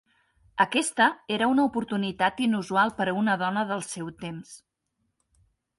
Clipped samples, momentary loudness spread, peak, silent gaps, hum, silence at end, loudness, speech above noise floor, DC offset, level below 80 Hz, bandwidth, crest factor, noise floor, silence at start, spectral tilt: under 0.1%; 13 LU; -6 dBFS; none; none; 1.2 s; -25 LUFS; 52 dB; under 0.1%; -66 dBFS; 11.5 kHz; 20 dB; -77 dBFS; 0.55 s; -4 dB/octave